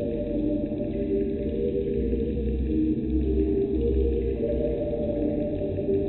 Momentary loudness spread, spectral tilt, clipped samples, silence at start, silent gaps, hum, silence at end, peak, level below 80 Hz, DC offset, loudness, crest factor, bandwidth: 3 LU; -10 dB/octave; under 0.1%; 0 s; none; none; 0 s; -12 dBFS; -32 dBFS; under 0.1%; -27 LUFS; 12 dB; 4.2 kHz